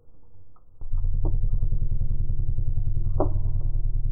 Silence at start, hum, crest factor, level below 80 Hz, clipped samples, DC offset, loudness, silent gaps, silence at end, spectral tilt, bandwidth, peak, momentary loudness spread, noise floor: 0.05 s; none; 14 dB; -24 dBFS; under 0.1%; under 0.1%; -30 LUFS; none; 0 s; -15.5 dB/octave; 1.4 kHz; -8 dBFS; 4 LU; -50 dBFS